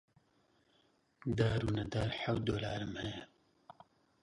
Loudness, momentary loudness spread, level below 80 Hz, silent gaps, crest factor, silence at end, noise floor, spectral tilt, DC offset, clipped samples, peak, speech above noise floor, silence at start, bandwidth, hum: -37 LUFS; 10 LU; -56 dBFS; none; 20 dB; 0.95 s; -73 dBFS; -6.5 dB/octave; under 0.1%; under 0.1%; -18 dBFS; 37 dB; 1.25 s; 11 kHz; none